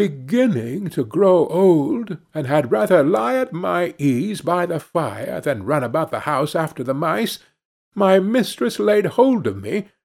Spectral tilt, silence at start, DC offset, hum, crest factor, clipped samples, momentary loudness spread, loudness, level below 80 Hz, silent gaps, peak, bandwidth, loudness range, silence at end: -6.5 dB/octave; 0 s; under 0.1%; none; 16 dB; under 0.1%; 10 LU; -19 LUFS; -64 dBFS; 7.65-7.92 s; -2 dBFS; 16.5 kHz; 4 LU; 0.2 s